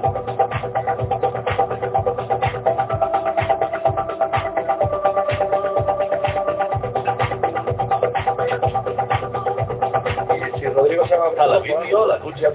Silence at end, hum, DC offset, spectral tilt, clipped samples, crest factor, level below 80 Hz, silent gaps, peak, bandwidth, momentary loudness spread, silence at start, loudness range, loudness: 0 s; none; under 0.1%; -10 dB/octave; under 0.1%; 16 dB; -42 dBFS; none; -4 dBFS; 4 kHz; 5 LU; 0 s; 2 LU; -20 LUFS